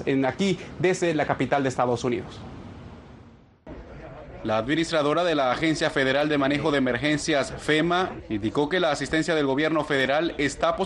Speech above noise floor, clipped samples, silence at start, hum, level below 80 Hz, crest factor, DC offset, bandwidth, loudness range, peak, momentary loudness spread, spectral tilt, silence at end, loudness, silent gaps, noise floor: 27 dB; under 0.1%; 0 s; none; -50 dBFS; 18 dB; under 0.1%; 11.5 kHz; 7 LU; -6 dBFS; 19 LU; -5 dB/octave; 0 s; -24 LUFS; none; -50 dBFS